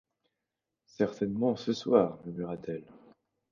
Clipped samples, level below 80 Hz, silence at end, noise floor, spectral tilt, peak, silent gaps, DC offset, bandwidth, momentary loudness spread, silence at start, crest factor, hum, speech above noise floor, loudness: under 0.1%; -68 dBFS; 0.7 s; -87 dBFS; -7 dB/octave; -10 dBFS; none; under 0.1%; 7.2 kHz; 13 LU; 1 s; 22 dB; none; 57 dB; -31 LUFS